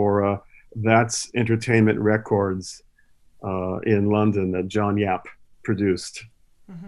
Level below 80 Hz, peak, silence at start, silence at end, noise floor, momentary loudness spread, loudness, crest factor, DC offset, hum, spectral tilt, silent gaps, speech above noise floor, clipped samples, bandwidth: -56 dBFS; -2 dBFS; 0 s; 0 s; -55 dBFS; 15 LU; -22 LUFS; 20 dB; under 0.1%; none; -6 dB/octave; none; 34 dB; under 0.1%; 12 kHz